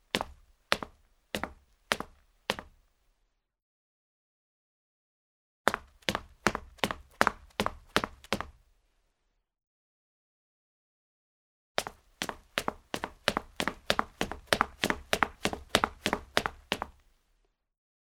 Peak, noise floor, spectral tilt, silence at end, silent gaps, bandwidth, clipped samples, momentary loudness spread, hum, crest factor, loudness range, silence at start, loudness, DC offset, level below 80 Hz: -2 dBFS; -78 dBFS; -3 dB/octave; 1.25 s; 3.62-5.65 s, 9.67-11.75 s; 19.5 kHz; under 0.1%; 10 LU; none; 34 dB; 13 LU; 0.15 s; -33 LUFS; under 0.1%; -54 dBFS